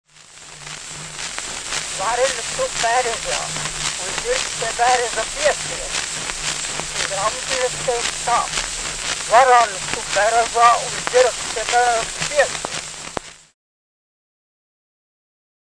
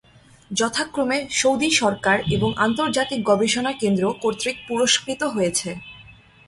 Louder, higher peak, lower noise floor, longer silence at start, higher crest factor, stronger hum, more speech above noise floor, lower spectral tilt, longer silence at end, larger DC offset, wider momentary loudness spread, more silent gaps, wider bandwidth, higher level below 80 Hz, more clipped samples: about the same, -19 LUFS vs -21 LUFS; first, 0 dBFS vs -4 dBFS; second, -42 dBFS vs -47 dBFS; second, 0.2 s vs 0.5 s; about the same, 20 dB vs 18 dB; neither; about the same, 23 dB vs 26 dB; second, -0.5 dB/octave vs -3.5 dB/octave; first, 2.25 s vs 0.35 s; neither; first, 13 LU vs 7 LU; neither; second, 10.5 kHz vs 12 kHz; first, -44 dBFS vs -52 dBFS; neither